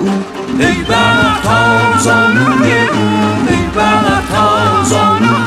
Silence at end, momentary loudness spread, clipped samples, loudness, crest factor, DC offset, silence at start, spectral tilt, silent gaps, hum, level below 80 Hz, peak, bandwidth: 0 s; 4 LU; under 0.1%; -10 LUFS; 10 dB; under 0.1%; 0 s; -5 dB/octave; none; none; -34 dBFS; 0 dBFS; 15 kHz